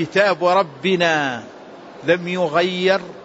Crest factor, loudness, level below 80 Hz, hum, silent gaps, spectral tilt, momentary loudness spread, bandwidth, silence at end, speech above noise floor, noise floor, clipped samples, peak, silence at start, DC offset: 16 dB; -18 LUFS; -64 dBFS; none; none; -5 dB/octave; 9 LU; 8 kHz; 0 s; 20 dB; -39 dBFS; under 0.1%; -4 dBFS; 0 s; under 0.1%